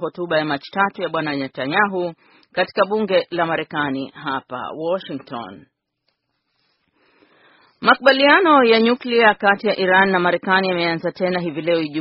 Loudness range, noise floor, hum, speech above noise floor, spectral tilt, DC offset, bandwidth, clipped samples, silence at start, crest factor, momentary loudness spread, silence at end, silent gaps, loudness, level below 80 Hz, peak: 14 LU; -72 dBFS; none; 54 dB; -2.5 dB/octave; under 0.1%; 5.8 kHz; under 0.1%; 0 s; 20 dB; 14 LU; 0 s; none; -18 LUFS; -64 dBFS; 0 dBFS